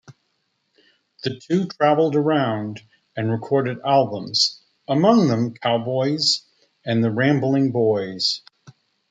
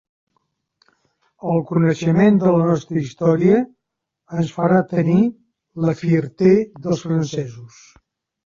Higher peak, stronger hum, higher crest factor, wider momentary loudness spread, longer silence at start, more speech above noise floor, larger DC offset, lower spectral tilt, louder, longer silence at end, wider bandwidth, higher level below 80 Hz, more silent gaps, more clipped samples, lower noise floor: about the same, -4 dBFS vs -2 dBFS; neither; about the same, 18 dB vs 16 dB; about the same, 12 LU vs 11 LU; second, 0.1 s vs 1.45 s; second, 51 dB vs 63 dB; neither; second, -5.5 dB/octave vs -8 dB/octave; about the same, -20 LUFS vs -18 LUFS; about the same, 0.7 s vs 0.8 s; first, 9.4 kHz vs 7.4 kHz; second, -68 dBFS vs -56 dBFS; neither; neither; second, -71 dBFS vs -80 dBFS